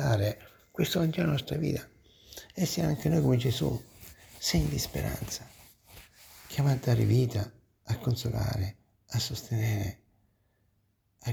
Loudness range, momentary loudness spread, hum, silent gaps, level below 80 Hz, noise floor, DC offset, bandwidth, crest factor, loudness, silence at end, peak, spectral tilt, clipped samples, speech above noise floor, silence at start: 4 LU; 17 LU; none; none; -48 dBFS; -72 dBFS; under 0.1%; over 20 kHz; 16 dB; -30 LUFS; 0 s; -14 dBFS; -5.5 dB/octave; under 0.1%; 44 dB; 0 s